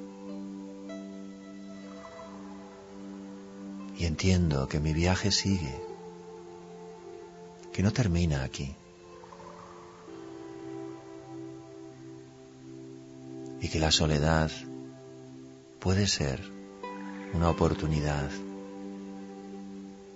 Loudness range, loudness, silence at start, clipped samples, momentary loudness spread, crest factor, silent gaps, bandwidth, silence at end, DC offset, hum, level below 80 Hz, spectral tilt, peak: 15 LU; -30 LUFS; 0 s; under 0.1%; 21 LU; 22 dB; none; 8 kHz; 0 s; under 0.1%; none; -46 dBFS; -5 dB/octave; -10 dBFS